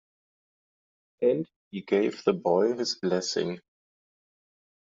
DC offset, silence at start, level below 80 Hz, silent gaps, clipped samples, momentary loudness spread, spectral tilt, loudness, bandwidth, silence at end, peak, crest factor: under 0.1%; 1.2 s; -72 dBFS; 1.56-1.71 s; under 0.1%; 11 LU; -4.5 dB/octave; -27 LUFS; 7.8 kHz; 1.4 s; -10 dBFS; 20 dB